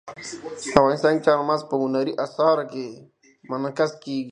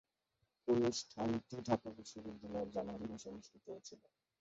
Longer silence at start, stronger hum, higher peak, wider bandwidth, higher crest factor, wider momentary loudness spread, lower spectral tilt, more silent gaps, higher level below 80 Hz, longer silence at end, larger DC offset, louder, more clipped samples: second, 0.05 s vs 0.65 s; neither; first, 0 dBFS vs -20 dBFS; first, 10.5 kHz vs 8 kHz; about the same, 22 dB vs 22 dB; about the same, 15 LU vs 17 LU; about the same, -5.5 dB/octave vs -5.5 dB/octave; neither; first, -54 dBFS vs -70 dBFS; second, 0 s vs 0.45 s; neither; first, -22 LUFS vs -41 LUFS; neither